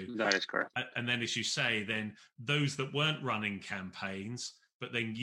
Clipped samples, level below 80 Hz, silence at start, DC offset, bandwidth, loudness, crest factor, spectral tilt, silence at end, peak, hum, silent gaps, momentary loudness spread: under 0.1%; -76 dBFS; 0 s; under 0.1%; 16 kHz; -34 LUFS; 24 dB; -3.5 dB/octave; 0 s; -10 dBFS; none; 4.74-4.80 s; 10 LU